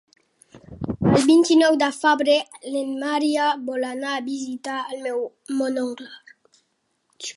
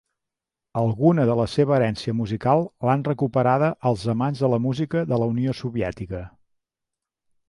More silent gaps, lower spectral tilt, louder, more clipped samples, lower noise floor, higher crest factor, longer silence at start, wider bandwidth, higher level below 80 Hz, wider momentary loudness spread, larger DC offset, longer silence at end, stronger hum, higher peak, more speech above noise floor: neither; second, -5 dB/octave vs -8 dB/octave; about the same, -21 LUFS vs -22 LUFS; neither; second, -71 dBFS vs -86 dBFS; about the same, 18 dB vs 18 dB; about the same, 0.7 s vs 0.75 s; about the same, 11.5 kHz vs 11.5 kHz; about the same, -54 dBFS vs -50 dBFS; first, 14 LU vs 8 LU; neither; second, 0.05 s vs 1.2 s; neither; about the same, -4 dBFS vs -4 dBFS; second, 50 dB vs 64 dB